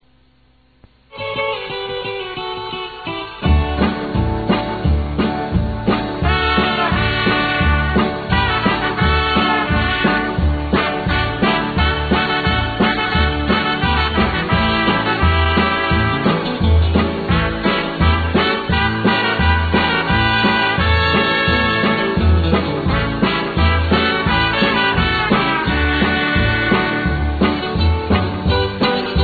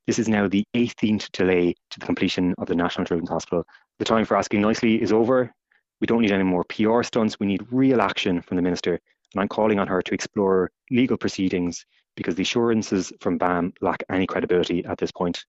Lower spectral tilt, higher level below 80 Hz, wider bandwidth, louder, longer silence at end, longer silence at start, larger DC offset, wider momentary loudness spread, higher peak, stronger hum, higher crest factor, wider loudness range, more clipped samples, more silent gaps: first, -8 dB/octave vs -5 dB/octave; first, -24 dBFS vs -54 dBFS; second, 4.8 kHz vs 8 kHz; first, -16 LUFS vs -23 LUFS; about the same, 0 s vs 0.05 s; first, 1.15 s vs 0.1 s; neither; second, 5 LU vs 8 LU; first, 0 dBFS vs -4 dBFS; neither; about the same, 16 dB vs 18 dB; about the same, 4 LU vs 2 LU; neither; neither